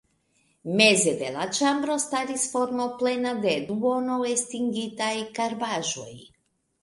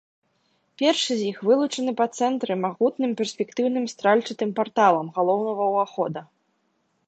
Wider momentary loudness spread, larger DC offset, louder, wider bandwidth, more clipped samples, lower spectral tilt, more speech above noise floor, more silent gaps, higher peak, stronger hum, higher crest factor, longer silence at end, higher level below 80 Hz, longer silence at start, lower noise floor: first, 10 LU vs 7 LU; neither; about the same, -25 LUFS vs -23 LUFS; first, 11.5 kHz vs 9 kHz; neither; second, -3 dB/octave vs -4.5 dB/octave; about the same, 46 dB vs 48 dB; neither; about the same, -2 dBFS vs -4 dBFS; neither; about the same, 24 dB vs 20 dB; second, 0.6 s vs 0.85 s; first, -68 dBFS vs -76 dBFS; second, 0.65 s vs 0.8 s; about the same, -72 dBFS vs -70 dBFS